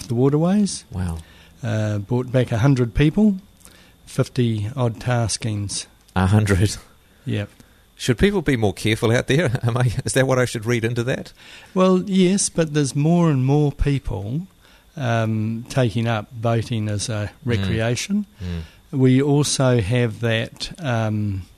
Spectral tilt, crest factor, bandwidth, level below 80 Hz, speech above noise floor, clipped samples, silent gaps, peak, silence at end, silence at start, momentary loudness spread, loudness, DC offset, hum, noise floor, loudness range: -6 dB/octave; 16 dB; 13.5 kHz; -40 dBFS; 29 dB; under 0.1%; none; -4 dBFS; 0.15 s; 0 s; 11 LU; -21 LUFS; under 0.1%; none; -48 dBFS; 4 LU